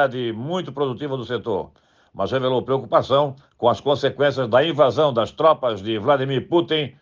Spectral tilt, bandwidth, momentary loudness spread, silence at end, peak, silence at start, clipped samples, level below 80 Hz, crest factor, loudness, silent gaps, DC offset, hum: -6.5 dB/octave; 7.2 kHz; 9 LU; 0.1 s; -4 dBFS; 0 s; under 0.1%; -60 dBFS; 16 dB; -21 LUFS; none; under 0.1%; none